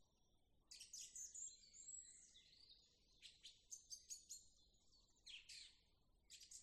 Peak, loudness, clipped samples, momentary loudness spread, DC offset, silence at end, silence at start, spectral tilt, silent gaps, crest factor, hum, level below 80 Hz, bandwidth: -44 dBFS; -58 LUFS; under 0.1%; 13 LU; under 0.1%; 0 s; 0 s; 2 dB/octave; none; 20 dB; none; -84 dBFS; 13.5 kHz